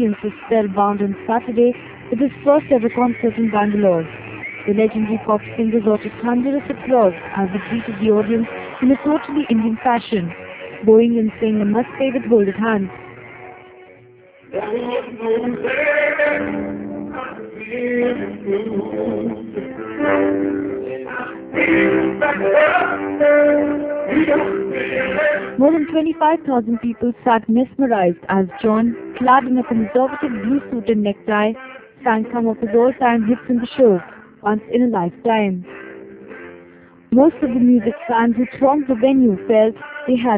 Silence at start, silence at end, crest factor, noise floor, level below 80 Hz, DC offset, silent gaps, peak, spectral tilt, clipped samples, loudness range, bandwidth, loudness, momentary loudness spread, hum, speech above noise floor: 0 s; 0 s; 18 dB; -46 dBFS; -52 dBFS; under 0.1%; none; 0 dBFS; -10.5 dB/octave; under 0.1%; 5 LU; 4 kHz; -18 LUFS; 13 LU; none; 29 dB